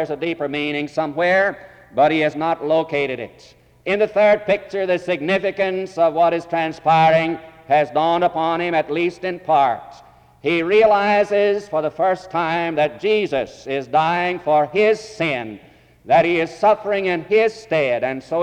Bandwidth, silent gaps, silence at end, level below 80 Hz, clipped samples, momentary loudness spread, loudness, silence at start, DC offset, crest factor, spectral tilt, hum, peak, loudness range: 9.2 kHz; none; 0 s; -58 dBFS; under 0.1%; 8 LU; -19 LUFS; 0 s; under 0.1%; 14 dB; -6 dB/octave; none; -4 dBFS; 2 LU